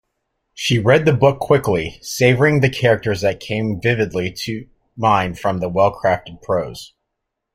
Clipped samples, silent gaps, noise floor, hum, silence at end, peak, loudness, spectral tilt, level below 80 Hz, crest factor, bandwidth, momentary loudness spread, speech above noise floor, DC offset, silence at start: under 0.1%; none; -78 dBFS; none; 0.7 s; -2 dBFS; -18 LUFS; -6 dB/octave; -46 dBFS; 16 dB; 16 kHz; 10 LU; 61 dB; under 0.1%; 0.55 s